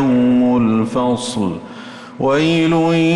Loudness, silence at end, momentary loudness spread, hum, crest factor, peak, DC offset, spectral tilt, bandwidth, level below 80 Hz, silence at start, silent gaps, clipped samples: -15 LUFS; 0 s; 17 LU; none; 8 dB; -6 dBFS; under 0.1%; -6 dB/octave; 11.5 kHz; -48 dBFS; 0 s; none; under 0.1%